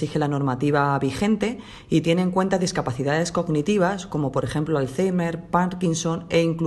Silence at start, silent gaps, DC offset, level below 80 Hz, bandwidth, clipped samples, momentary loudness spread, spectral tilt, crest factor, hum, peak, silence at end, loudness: 0 s; none; under 0.1%; -50 dBFS; 12 kHz; under 0.1%; 4 LU; -6 dB/octave; 16 dB; none; -6 dBFS; 0 s; -23 LUFS